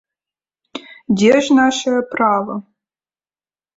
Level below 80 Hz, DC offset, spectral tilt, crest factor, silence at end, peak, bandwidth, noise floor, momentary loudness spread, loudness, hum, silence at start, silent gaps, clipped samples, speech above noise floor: -60 dBFS; under 0.1%; -4.5 dB/octave; 16 dB; 1.15 s; -2 dBFS; 8 kHz; under -90 dBFS; 21 LU; -15 LUFS; none; 0.75 s; none; under 0.1%; over 76 dB